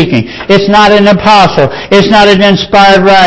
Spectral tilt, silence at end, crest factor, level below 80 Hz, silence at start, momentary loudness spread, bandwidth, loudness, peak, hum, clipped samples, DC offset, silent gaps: -5.5 dB/octave; 0 s; 4 dB; -34 dBFS; 0 s; 6 LU; 8 kHz; -5 LUFS; 0 dBFS; none; 9%; under 0.1%; none